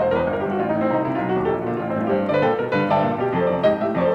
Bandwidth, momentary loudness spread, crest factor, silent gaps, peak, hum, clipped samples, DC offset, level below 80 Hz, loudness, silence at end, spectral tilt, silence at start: 6.8 kHz; 4 LU; 14 dB; none; -6 dBFS; none; under 0.1%; under 0.1%; -52 dBFS; -21 LUFS; 0 s; -8.5 dB/octave; 0 s